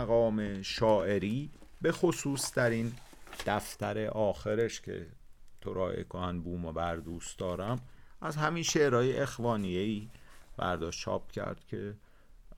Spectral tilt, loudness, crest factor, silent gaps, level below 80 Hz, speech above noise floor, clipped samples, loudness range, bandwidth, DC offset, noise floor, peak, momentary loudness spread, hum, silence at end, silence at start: -5 dB/octave; -33 LUFS; 18 dB; none; -54 dBFS; 21 dB; under 0.1%; 5 LU; 19.5 kHz; under 0.1%; -53 dBFS; -14 dBFS; 14 LU; none; 0 s; 0 s